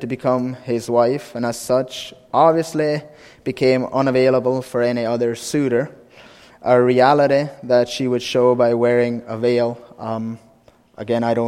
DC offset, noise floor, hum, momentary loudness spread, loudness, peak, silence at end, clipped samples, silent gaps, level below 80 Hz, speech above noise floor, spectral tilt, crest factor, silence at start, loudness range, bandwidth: under 0.1%; -52 dBFS; none; 12 LU; -18 LUFS; 0 dBFS; 0 s; under 0.1%; none; -58 dBFS; 34 dB; -6 dB/octave; 18 dB; 0 s; 3 LU; 15 kHz